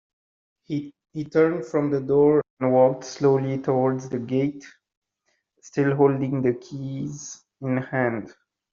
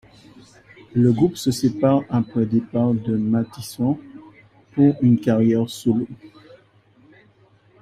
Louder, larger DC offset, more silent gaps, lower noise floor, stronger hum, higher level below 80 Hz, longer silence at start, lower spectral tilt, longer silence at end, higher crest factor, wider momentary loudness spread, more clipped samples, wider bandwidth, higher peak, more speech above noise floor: second, -23 LUFS vs -20 LUFS; neither; first, 2.50-2.57 s, 4.97-5.02 s vs none; first, -73 dBFS vs -55 dBFS; neither; second, -64 dBFS vs -56 dBFS; second, 0.7 s vs 0.95 s; about the same, -7.5 dB/octave vs -7.5 dB/octave; second, 0.4 s vs 1.55 s; about the same, 18 dB vs 18 dB; first, 14 LU vs 8 LU; neither; second, 7.4 kHz vs 15.5 kHz; about the same, -6 dBFS vs -4 dBFS; first, 51 dB vs 36 dB